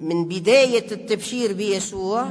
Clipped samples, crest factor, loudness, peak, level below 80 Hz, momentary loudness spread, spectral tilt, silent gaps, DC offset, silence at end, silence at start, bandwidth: under 0.1%; 16 dB; -21 LUFS; -4 dBFS; -58 dBFS; 9 LU; -4 dB/octave; none; under 0.1%; 0 s; 0 s; 11 kHz